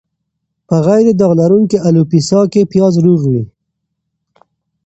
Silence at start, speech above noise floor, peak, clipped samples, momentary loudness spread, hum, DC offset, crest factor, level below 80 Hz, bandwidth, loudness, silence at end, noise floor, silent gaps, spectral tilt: 0.7 s; 62 dB; 0 dBFS; under 0.1%; 7 LU; none; under 0.1%; 12 dB; -50 dBFS; 8.2 kHz; -11 LUFS; 1.4 s; -72 dBFS; none; -8 dB/octave